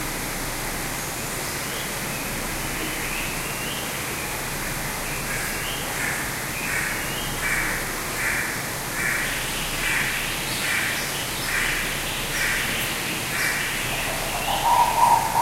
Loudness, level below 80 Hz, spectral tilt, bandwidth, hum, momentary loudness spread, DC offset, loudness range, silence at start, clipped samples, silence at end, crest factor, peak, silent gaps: -24 LUFS; -40 dBFS; -2 dB/octave; 16 kHz; none; 5 LU; under 0.1%; 4 LU; 0 s; under 0.1%; 0 s; 20 dB; -6 dBFS; none